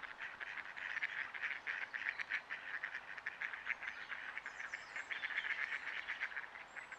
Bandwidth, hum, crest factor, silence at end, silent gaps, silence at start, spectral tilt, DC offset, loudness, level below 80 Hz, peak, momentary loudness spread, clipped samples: 11.5 kHz; none; 22 dB; 0 s; none; 0 s; -0.5 dB/octave; under 0.1%; -43 LUFS; -82 dBFS; -22 dBFS; 7 LU; under 0.1%